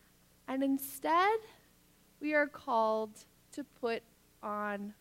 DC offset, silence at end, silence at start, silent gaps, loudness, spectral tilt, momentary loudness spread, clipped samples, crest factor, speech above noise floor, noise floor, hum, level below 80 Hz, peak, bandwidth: under 0.1%; 0.1 s; 0.5 s; none; -34 LUFS; -4 dB/octave; 17 LU; under 0.1%; 18 dB; 32 dB; -66 dBFS; 60 Hz at -75 dBFS; -74 dBFS; -18 dBFS; 16 kHz